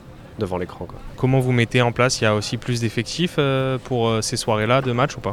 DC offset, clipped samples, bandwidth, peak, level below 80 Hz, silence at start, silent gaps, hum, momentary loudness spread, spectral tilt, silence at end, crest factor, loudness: under 0.1%; under 0.1%; 14.5 kHz; -4 dBFS; -44 dBFS; 0 s; none; none; 10 LU; -5 dB/octave; 0 s; 18 dB; -21 LUFS